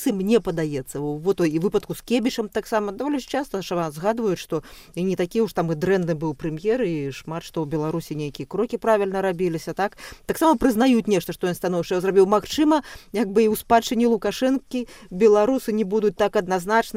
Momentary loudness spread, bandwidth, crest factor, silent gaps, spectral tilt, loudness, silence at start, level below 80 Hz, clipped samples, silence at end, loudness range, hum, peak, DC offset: 10 LU; 16 kHz; 16 dB; none; -6 dB/octave; -23 LUFS; 0 s; -50 dBFS; under 0.1%; 0 s; 5 LU; none; -6 dBFS; under 0.1%